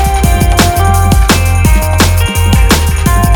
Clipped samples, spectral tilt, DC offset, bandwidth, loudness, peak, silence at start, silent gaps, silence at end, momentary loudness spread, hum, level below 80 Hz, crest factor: 0.5%; -4.5 dB/octave; under 0.1%; over 20 kHz; -9 LUFS; 0 dBFS; 0 s; none; 0 s; 2 LU; none; -12 dBFS; 8 dB